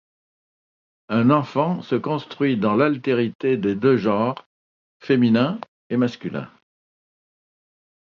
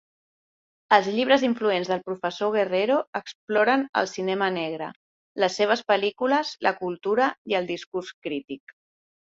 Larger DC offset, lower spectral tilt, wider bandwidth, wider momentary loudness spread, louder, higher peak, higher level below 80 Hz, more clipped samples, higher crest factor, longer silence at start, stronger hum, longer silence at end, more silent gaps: neither; first, -8.5 dB/octave vs -4.5 dB/octave; second, 6.8 kHz vs 7.8 kHz; about the same, 13 LU vs 12 LU; first, -21 LUFS vs -24 LUFS; about the same, -4 dBFS vs -2 dBFS; first, -64 dBFS vs -72 dBFS; neither; about the same, 18 dB vs 22 dB; first, 1.1 s vs 0.9 s; neither; first, 1.65 s vs 0.65 s; second, 3.35-3.39 s, 4.46-5.00 s, 5.68-5.90 s vs 3.07-3.13 s, 3.35-3.47 s, 3.89-3.93 s, 4.96-5.35 s, 7.38-7.45 s, 7.87-7.92 s, 8.14-8.22 s, 8.60-8.67 s